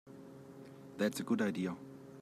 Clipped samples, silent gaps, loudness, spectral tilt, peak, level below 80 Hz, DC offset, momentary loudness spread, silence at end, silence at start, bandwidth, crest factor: under 0.1%; none; -37 LUFS; -5.5 dB/octave; -20 dBFS; -80 dBFS; under 0.1%; 19 LU; 0 s; 0.05 s; 15.5 kHz; 18 dB